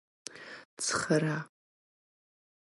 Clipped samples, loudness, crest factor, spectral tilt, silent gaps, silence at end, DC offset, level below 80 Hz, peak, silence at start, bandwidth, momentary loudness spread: under 0.1%; -31 LUFS; 20 dB; -4 dB/octave; 0.65-0.77 s; 1.15 s; under 0.1%; -72 dBFS; -14 dBFS; 0.3 s; 11.5 kHz; 19 LU